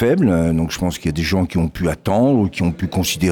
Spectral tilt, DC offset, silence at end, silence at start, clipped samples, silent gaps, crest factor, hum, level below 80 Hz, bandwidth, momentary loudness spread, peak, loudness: -6 dB/octave; under 0.1%; 0 s; 0 s; under 0.1%; none; 10 dB; none; -34 dBFS; 18 kHz; 6 LU; -6 dBFS; -18 LUFS